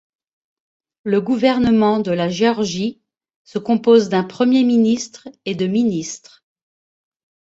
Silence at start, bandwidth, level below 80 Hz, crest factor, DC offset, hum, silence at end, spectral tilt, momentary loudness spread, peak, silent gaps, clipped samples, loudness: 1.05 s; 8 kHz; -54 dBFS; 16 dB; under 0.1%; none; 1.3 s; -5.5 dB/octave; 15 LU; -2 dBFS; 3.36-3.45 s; under 0.1%; -17 LUFS